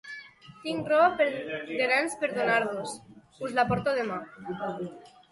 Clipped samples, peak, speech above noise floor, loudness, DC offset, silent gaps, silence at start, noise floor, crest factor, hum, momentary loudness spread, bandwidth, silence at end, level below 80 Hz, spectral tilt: under 0.1%; -10 dBFS; 20 dB; -28 LUFS; under 0.1%; none; 0.05 s; -48 dBFS; 18 dB; none; 16 LU; 11.5 kHz; 0.25 s; -62 dBFS; -4.5 dB/octave